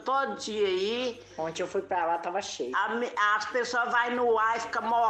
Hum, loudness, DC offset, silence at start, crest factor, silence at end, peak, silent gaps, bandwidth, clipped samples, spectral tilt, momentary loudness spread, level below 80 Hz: none; -28 LUFS; under 0.1%; 0 s; 16 dB; 0 s; -12 dBFS; none; 9.2 kHz; under 0.1%; -3 dB/octave; 7 LU; -68 dBFS